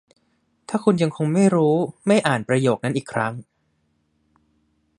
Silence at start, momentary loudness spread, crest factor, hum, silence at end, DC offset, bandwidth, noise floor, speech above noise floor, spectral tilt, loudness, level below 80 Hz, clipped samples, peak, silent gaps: 0.7 s; 8 LU; 20 dB; none; 1.55 s; under 0.1%; 11.5 kHz; -68 dBFS; 48 dB; -6.5 dB/octave; -21 LUFS; -64 dBFS; under 0.1%; -2 dBFS; none